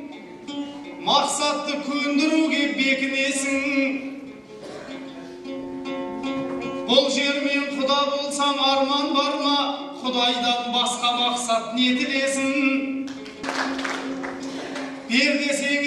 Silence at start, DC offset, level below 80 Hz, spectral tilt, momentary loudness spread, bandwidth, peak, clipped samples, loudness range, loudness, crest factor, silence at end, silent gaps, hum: 0 s; under 0.1%; -64 dBFS; -2 dB/octave; 15 LU; 12.5 kHz; -4 dBFS; under 0.1%; 5 LU; -22 LUFS; 20 dB; 0 s; none; none